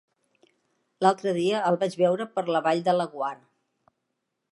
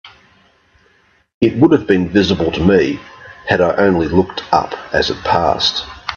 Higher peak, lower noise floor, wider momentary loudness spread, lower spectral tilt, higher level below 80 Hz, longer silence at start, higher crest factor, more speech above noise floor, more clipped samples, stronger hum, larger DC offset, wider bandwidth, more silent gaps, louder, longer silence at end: second, -6 dBFS vs 0 dBFS; first, -80 dBFS vs -55 dBFS; about the same, 8 LU vs 6 LU; about the same, -6 dB/octave vs -6 dB/octave; second, -80 dBFS vs -42 dBFS; first, 1 s vs 0.05 s; first, 22 dB vs 16 dB; first, 56 dB vs 41 dB; neither; neither; neither; first, 11.5 kHz vs 7.2 kHz; second, none vs 1.34-1.41 s; second, -25 LUFS vs -14 LUFS; first, 1.15 s vs 0 s